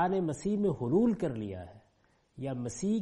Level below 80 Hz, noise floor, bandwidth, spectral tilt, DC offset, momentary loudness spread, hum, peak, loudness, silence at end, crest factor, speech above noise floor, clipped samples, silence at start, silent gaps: -60 dBFS; -70 dBFS; 11 kHz; -7 dB/octave; under 0.1%; 14 LU; none; -16 dBFS; -32 LUFS; 0 s; 16 dB; 39 dB; under 0.1%; 0 s; none